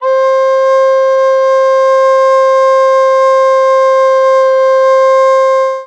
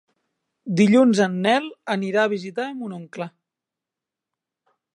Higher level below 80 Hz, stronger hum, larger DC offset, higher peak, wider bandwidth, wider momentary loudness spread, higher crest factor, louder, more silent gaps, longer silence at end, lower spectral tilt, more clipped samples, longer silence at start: second, under -90 dBFS vs -72 dBFS; neither; neither; about the same, -2 dBFS vs -4 dBFS; second, 8.4 kHz vs 11 kHz; second, 1 LU vs 18 LU; second, 6 dB vs 18 dB; first, -8 LUFS vs -20 LUFS; neither; second, 0 s vs 1.65 s; second, 1.5 dB/octave vs -6 dB/octave; neither; second, 0 s vs 0.65 s